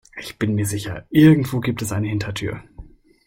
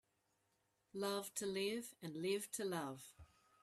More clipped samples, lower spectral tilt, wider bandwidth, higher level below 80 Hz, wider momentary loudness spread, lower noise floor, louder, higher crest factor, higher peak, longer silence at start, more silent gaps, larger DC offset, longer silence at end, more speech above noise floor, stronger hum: neither; first, -6.5 dB/octave vs -3.5 dB/octave; about the same, 16.5 kHz vs 15.5 kHz; first, -46 dBFS vs -80 dBFS; first, 15 LU vs 11 LU; second, -42 dBFS vs -83 dBFS; first, -20 LUFS vs -44 LUFS; about the same, 18 dB vs 18 dB; first, -2 dBFS vs -28 dBFS; second, 0.15 s vs 0.95 s; neither; neither; about the same, 0.45 s vs 0.35 s; second, 23 dB vs 39 dB; neither